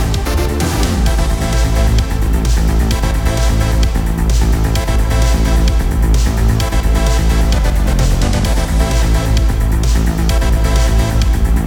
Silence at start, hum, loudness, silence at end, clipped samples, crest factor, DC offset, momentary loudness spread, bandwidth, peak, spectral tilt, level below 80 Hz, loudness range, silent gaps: 0 s; none; -15 LUFS; 0 s; under 0.1%; 10 dB; under 0.1%; 2 LU; 17 kHz; -2 dBFS; -5.5 dB/octave; -14 dBFS; 1 LU; none